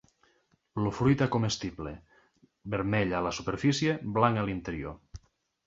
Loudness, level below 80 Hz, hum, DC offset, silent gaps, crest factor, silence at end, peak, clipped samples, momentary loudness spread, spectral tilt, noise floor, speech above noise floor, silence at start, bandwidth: -29 LUFS; -52 dBFS; none; under 0.1%; none; 22 dB; 0.5 s; -8 dBFS; under 0.1%; 15 LU; -6 dB/octave; -70 dBFS; 41 dB; 0.75 s; 7.8 kHz